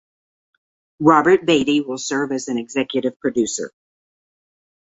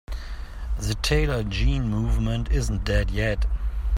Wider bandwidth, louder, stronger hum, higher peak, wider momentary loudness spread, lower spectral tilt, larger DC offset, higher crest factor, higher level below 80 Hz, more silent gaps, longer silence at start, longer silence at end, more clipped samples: second, 8 kHz vs 15 kHz; first, -19 LUFS vs -25 LUFS; neither; first, -2 dBFS vs -8 dBFS; about the same, 10 LU vs 12 LU; second, -4 dB/octave vs -5.5 dB/octave; neither; about the same, 20 dB vs 16 dB; second, -60 dBFS vs -26 dBFS; first, 3.16-3.20 s vs none; first, 1 s vs 0.1 s; first, 1.2 s vs 0 s; neither